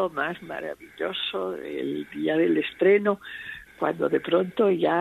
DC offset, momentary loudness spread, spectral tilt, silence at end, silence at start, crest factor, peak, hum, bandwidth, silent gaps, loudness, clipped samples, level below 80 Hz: under 0.1%; 13 LU; -7 dB/octave; 0 s; 0 s; 16 dB; -8 dBFS; none; 13.5 kHz; none; -25 LUFS; under 0.1%; -64 dBFS